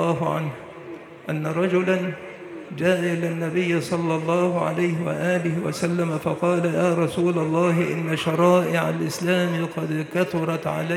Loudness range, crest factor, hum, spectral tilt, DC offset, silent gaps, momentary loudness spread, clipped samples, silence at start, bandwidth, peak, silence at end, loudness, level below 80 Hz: 3 LU; 18 dB; none; -6.5 dB/octave; under 0.1%; none; 10 LU; under 0.1%; 0 s; 15 kHz; -6 dBFS; 0 s; -23 LUFS; -66 dBFS